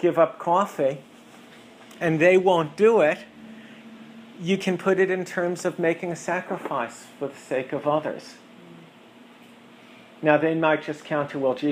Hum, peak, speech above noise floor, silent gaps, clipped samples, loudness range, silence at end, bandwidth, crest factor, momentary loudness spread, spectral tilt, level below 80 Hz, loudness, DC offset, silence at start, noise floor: none; -4 dBFS; 27 dB; none; under 0.1%; 8 LU; 0 s; 15.5 kHz; 20 dB; 25 LU; -6 dB/octave; -72 dBFS; -23 LUFS; under 0.1%; 0 s; -49 dBFS